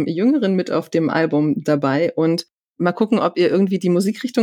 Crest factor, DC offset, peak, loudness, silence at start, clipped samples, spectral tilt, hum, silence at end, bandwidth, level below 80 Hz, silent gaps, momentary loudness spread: 14 dB; under 0.1%; -4 dBFS; -18 LUFS; 0 s; under 0.1%; -7 dB/octave; none; 0 s; 15 kHz; -70 dBFS; 2.57-2.63 s, 2.69-2.74 s; 4 LU